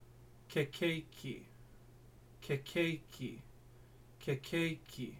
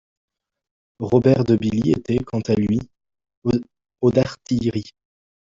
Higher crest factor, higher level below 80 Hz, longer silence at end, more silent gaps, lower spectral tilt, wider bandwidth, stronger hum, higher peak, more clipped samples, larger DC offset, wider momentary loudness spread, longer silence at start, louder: about the same, 20 dB vs 18 dB; second, -64 dBFS vs -48 dBFS; second, 0 s vs 0.65 s; second, none vs 3.37-3.42 s; second, -5.5 dB/octave vs -8 dB/octave; first, 17 kHz vs 7.6 kHz; neither; second, -22 dBFS vs -4 dBFS; neither; neither; first, 18 LU vs 9 LU; second, 0 s vs 1 s; second, -40 LUFS vs -21 LUFS